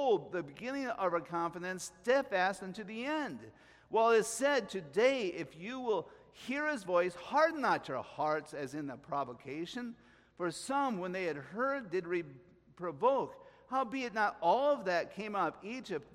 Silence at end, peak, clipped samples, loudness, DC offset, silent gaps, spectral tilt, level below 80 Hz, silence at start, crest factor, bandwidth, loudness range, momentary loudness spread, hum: 0.1 s; -16 dBFS; under 0.1%; -35 LUFS; under 0.1%; none; -4 dB/octave; -74 dBFS; 0 s; 20 dB; 15.5 kHz; 5 LU; 13 LU; none